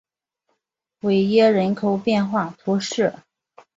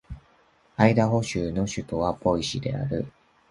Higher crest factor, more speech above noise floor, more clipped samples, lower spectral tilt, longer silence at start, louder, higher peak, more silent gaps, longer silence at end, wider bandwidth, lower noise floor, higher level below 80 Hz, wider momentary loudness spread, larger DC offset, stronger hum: second, 16 dB vs 24 dB; first, 56 dB vs 36 dB; neither; about the same, -6 dB/octave vs -6 dB/octave; first, 1.05 s vs 0.1 s; first, -20 LUFS vs -25 LUFS; about the same, -4 dBFS vs -2 dBFS; neither; first, 0.65 s vs 0.4 s; second, 7.8 kHz vs 11.5 kHz; first, -76 dBFS vs -61 dBFS; second, -64 dBFS vs -46 dBFS; second, 8 LU vs 18 LU; neither; neither